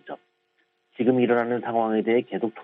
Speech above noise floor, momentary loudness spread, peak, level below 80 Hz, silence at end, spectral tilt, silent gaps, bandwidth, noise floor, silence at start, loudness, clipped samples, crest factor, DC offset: 47 dB; 12 LU; -8 dBFS; -74 dBFS; 0 s; -10 dB/octave; none; 4 kHz; -70 dBFS; 0.05 s; -23 LUFS; under 0.1%; 16 dB; under 0.1%